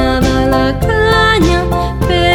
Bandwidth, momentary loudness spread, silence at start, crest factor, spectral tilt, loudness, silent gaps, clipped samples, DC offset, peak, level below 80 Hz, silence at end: 18 kHz; 5 LU; 0 s; 10 dB; -5.5 dB/octave; -12 LUFS; none; under 0.1%; under 0.1%; 0 dBFS; -20 dBFS; 0 s